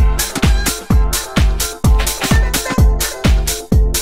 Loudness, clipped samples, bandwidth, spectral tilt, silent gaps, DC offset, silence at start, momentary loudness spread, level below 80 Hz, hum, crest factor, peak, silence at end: -15 LUFS; under 0.1%; 16.5 kHz; -4 dB/octave; none; under 0.1%; 0 s; 2 LU; -16 dBFS; none; 12 dB; -2 dBFS; 0 s